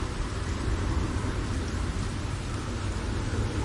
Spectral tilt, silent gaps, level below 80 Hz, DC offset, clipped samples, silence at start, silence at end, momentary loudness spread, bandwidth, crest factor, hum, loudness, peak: -5.5 dB/octave; none; -34 dBFS; under 0.1%; under 0.1%; 0 s; 0 s; 3 LU; 11.5 kHz; 14 dB; none; -31 LUFS; -16 dBFS